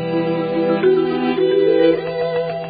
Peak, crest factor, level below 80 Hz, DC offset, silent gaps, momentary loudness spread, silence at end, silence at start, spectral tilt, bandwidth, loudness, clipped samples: -4 dBFS; 14 dB; -54 dBFS; under 0.1%; none; 6 LU; 0 s; 0 s; -11.5 dB/octave; 5 kHz; -17 LUFS; under 0.1%